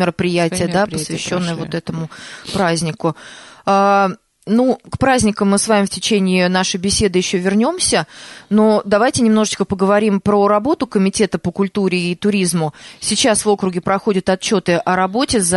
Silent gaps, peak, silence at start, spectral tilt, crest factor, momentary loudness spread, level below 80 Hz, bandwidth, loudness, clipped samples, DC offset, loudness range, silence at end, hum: none; -2 dBFS; 0 s; -4.5 dB/octave; 12 dB; 9 LU; -44 dBFS; 11.5 kHz; -16 LUFS; under 0.1%; under 0.1%; 4 LU; 0 s; none